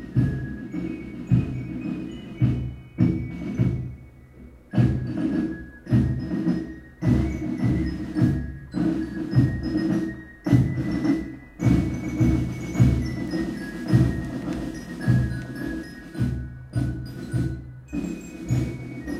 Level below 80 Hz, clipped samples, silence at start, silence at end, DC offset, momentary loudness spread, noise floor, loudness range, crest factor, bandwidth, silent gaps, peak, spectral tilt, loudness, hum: -36 dBFS; under 0.1%; 0 s; 0 s; under 0.1%; 12 LU; -46 dBFS; 5 LU; 20 dB; 11.5 kHz; none; -4 dBFS; -8.5 dB/octave; -26 LUFS; none